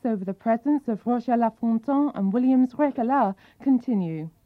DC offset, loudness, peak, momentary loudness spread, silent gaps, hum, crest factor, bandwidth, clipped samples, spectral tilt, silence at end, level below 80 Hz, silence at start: under 0.1%; -24 LUFS; -10 dBFS; 6 LU; none; none; 14 dB; 4.7 kHz; under 0.1%; -10 dB/octave; 0.15 s; -68 dBFS; 0.05 s